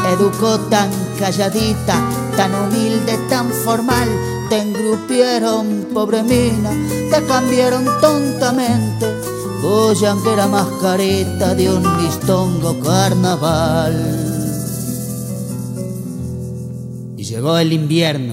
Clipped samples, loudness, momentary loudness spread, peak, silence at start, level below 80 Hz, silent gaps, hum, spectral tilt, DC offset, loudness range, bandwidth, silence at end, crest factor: under 0.1%; -16 LUFS; 10 LU; 0 dBFS; 0 s; -40 dBFS; none; none; -5.5 dB/octave; under 0.1%; 5 LU; 16 kHz; 0 s; 16 dB